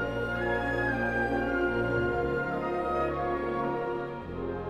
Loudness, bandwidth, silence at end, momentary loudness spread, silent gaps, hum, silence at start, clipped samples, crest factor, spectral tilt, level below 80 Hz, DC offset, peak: -30 LUFS; 12 kHz; 0 s; 5 LU; none; none; 0 s; under 0.1%; 12 dB; -7.5 dB/octave; -46 dBFS; under 0.1%; -18 dBFS